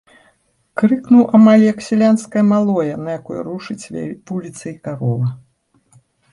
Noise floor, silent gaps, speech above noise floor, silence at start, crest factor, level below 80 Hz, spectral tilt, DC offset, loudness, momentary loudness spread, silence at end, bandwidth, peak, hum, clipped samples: -59 dBFS; none; 44 dB; 0.75 s; 14 dB; -58 dBFS; -7.5 dB/octave; under 0.1%; -15 LUFS; 18 LU; 0.95 s; 11 kHz; -2 dBFS; none; under 0.1%